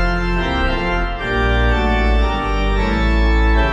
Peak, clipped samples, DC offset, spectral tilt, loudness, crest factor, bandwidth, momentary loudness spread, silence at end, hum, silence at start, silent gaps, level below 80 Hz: -4 dBFS; under 0.1%; under 0.1%; -6.5 dB/octave; -18 LUFS; 12 dB; 7.4 kHz; 4 LU; 0 s; none; 0 s; none; -18 dBFS